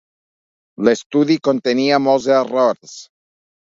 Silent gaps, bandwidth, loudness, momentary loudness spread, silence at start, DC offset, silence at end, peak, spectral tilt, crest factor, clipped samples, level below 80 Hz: 1.06-1.10 s; 7.8 kHz; -16 LUFS; 11 LU; 0.8 s; under 0.1%; 0.75 s; 0 dBFS; -5 dB/octave; 18 dB; under 0.1%; -62 dBFS